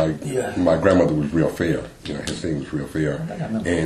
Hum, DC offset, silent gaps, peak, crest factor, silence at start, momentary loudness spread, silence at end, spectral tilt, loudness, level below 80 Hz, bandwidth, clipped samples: none; under 0.1%; none; -2 dBFS; 20 dB; 0 s; 11 LU; 0 s; -6.5 dB/octave; -22 LUFS; -42 dBFS; 14 kHz; under 0.1%